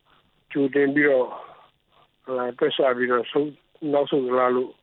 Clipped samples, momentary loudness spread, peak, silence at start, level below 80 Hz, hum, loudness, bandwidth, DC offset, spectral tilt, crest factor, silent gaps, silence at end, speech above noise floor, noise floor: under 0.1%; 12 LU; -8 dBFS; 0.5 s; -76 dBFS; none; -23 LUFS; 4.2 kHz; under 0.1%; -9 dB/octave; 16 dB; none; 0.1 s; 40 dB; -62 dBFS